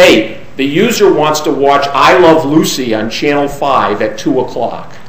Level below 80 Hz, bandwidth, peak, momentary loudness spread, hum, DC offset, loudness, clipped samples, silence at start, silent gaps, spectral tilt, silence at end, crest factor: -40 dBFS; 16 kHz; 0 dBFS; 9 LU; none; 5%; -10 LUFS; 0.8%; 0 s; none; -4.5 dB/octave; 0.1 s; 10 dB